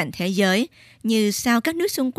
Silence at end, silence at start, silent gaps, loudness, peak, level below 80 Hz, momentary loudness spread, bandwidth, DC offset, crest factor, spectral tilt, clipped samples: 0.05 s; 0 s; none; -21 LUFS; -4 dBFS; -58 dBFS; 6 LU; 15.5 kHz; under 0.1%; 16 dB; -4 dB/octave; under 0.1%